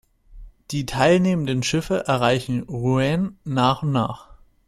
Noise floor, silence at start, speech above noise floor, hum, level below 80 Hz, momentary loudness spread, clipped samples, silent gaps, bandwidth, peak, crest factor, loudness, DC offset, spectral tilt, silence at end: -43 dBFS; 0.3 s; 22 dB; none; -46 dBFS; 10 LU; under 0.1%; none; 14 kHz; -4 dBFS; 18 dB; -21 LUFS; under 0.1%; -6 dB/octave; 0.35 s